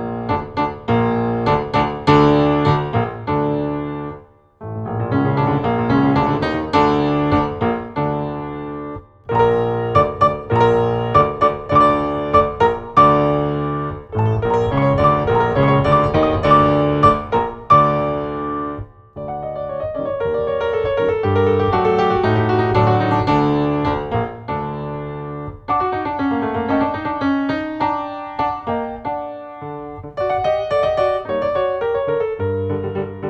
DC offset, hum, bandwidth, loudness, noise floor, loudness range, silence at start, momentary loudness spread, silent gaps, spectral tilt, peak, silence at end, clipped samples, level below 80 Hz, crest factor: under 0.1%; none; 8.2 kHz; -18 LUFS; -41 dBFS; 6 LU; 0 s; 13 LU; none; -8.5 dB/octave; -2 dBFS; 0 s; under 0.1%; -40 dBFS; 16 dB